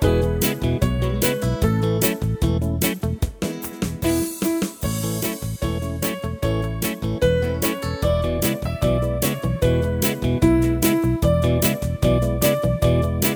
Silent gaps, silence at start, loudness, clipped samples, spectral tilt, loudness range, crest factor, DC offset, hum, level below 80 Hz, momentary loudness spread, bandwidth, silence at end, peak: none; 0 s; -21 LUFS; under 0.1%; -5.5 dB/octave; 5 LU; 16 dB; under 0.1%; none; -30 dBFS; 6 LU; over 20 kHz; 0 s; -4 dBFS